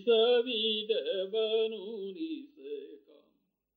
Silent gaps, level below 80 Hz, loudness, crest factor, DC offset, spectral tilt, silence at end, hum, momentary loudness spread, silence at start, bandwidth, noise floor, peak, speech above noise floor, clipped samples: none; -90 dBFS; -31 LUFS; 16 dB; under 0.1%; -6.5 dB/octave; 0.8 s; none; 18 LU; 0 s; 4.6 kHz; -76 dBFS; -16 dBFS; 46 dB; under 0.1%